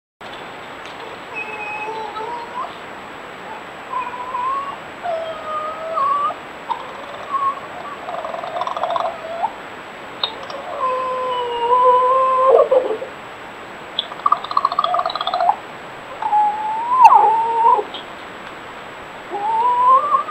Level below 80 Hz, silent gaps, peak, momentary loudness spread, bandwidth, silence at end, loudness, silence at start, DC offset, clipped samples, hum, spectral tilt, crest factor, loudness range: -60 dBFS; none; 0 dBFS; 19 LU; 15 kHz; 0 s; -19 LUFS; 0.2 s; under 0.1%; under 0.1%; none; -3.5 dB/octave; 20 dB; 11 LU